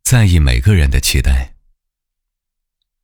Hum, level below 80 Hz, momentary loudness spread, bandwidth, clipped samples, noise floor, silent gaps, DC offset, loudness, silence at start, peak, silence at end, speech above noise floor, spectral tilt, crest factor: none; -18 dBFS; 8 LU; 19.5 kHz; under 0.1%; -77 dBFS; none; under 0.1%; -13 LUFS; 0.05 s; 0 dBFS; 1.55 s; 66 dB; -4.5 dB/octave; 14 dB